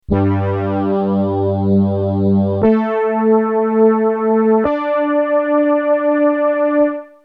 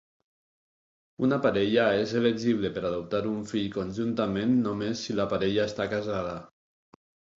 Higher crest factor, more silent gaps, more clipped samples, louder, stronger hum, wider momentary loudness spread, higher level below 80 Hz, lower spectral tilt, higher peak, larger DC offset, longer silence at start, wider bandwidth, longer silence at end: second, 12 dB vs 18 dB; neither; neither; first, -15 LUFS vs -28 LUFS; neither; second, 4 LU vs 8 LU; first, -44 dBFS vs -58 dBFS; first, -11 dB/octave vs -6 dB/octave; first, -2 dBFS vs -10 dBFS; neither; second, 0.1 s vs 1.2 s; second, 4.8 kHz vs 7.8 kHz; second, 0.2 s vs 0.95 s